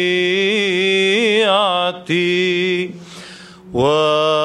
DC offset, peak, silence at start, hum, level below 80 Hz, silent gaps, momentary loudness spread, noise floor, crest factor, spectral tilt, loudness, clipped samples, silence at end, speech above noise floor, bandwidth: under 0.1%; -2 dBFS; 0 s; none; -54 dBFS; none; 14 LU; -37 dBFS; 14 dB; -4.5 dB/octave; -15 LUFS; under 0.1%; 0 s; 21 dB; 11.5 kHz